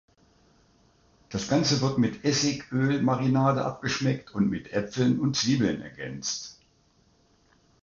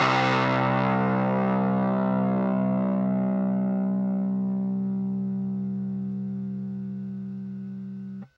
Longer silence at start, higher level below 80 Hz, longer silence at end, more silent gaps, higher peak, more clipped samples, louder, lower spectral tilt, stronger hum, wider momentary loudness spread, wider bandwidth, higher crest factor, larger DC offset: first, 1.3 s vs 0 s; first, -58 dBFS vs -64 dBFS; first, 1.3 s vs 0.1 s; neither; about the same, -10 dBFS vs -10 dBFS; neither; about the same, -26 LUFS vs -26 LUFS; second, -5 dB/octave vs -8 dB/octave; neither; about the same, 10 LU vs 12 LU; first, 7.6 kHz vs 6.8 kHz; about the same, 18 dB vs 16 dB; neither